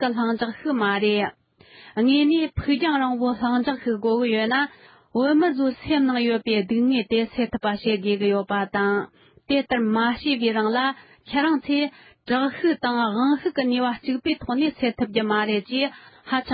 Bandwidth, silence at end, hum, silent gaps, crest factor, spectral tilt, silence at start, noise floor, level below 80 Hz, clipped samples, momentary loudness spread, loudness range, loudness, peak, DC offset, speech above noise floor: 5 kHz; 0 s; none; none; 16 dB; -10 dB/octave; 0 s; -49 dBFS; -52 dBFS; under 0.1%; 5 LU; 1 LU; -23 LUFS; -8 dBFS; under 0.1%; 27 dB